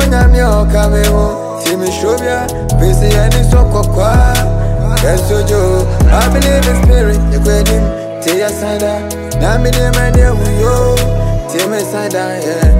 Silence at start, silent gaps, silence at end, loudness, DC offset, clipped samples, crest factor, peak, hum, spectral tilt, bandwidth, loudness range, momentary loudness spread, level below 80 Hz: 0 s; none; 0 s; -12 LUFS; under 0.1%; under 0.1%; 10 dB; 0 dBFS; none; -5.5 dB/octave; 16.5 kHz; 2 LU; 6 LU; -12 dBFS